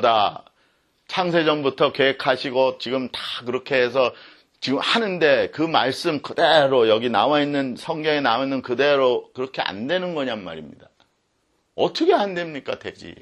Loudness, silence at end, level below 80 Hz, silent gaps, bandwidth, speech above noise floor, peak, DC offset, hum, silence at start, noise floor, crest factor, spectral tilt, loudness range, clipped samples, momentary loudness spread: -21 LUFS; 0.05 s; -66 dBFS; none; 12 kHz; 47 dB; -2 dBFS; under 0.1%; none; 0 s; -68 dBFS; 20 dB; -5 dB/octave; 6 LU; under 0.1%; 11 LU